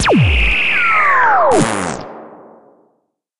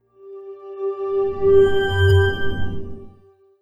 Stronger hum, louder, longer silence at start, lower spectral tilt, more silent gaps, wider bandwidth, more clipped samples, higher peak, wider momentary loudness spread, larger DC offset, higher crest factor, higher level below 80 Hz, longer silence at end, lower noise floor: neither; first, -12 LUFS vs -19 LUFS; about the same, 0 s vs 0 s; second, -4.5 dB/octave vs -7.5 dB/octave; neither; first, 11.5 kHz vs 9.4 kHz; neither; first, 0 dBFS vs -4 dBFS; second, 13 LU vs 22 LU; neither; about the same, 14 dB vs 16 dB; first, -26 dBFS vs -38 dBFS; about the same, 0 s vs 0 s; first, -65 dBFS vs -52 dBFS